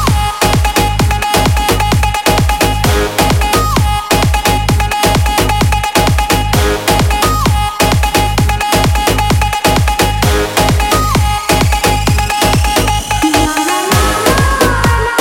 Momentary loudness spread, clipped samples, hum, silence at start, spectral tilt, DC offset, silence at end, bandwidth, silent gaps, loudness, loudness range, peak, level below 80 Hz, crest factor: 2 LU; under 0.1%; none; 0 s; -4 dB/octave; under 0.1%; 0 s; 17 kHz; none; -11 LUFS; 0 LU; 0 dBFS; -18 dBFS; 10 dB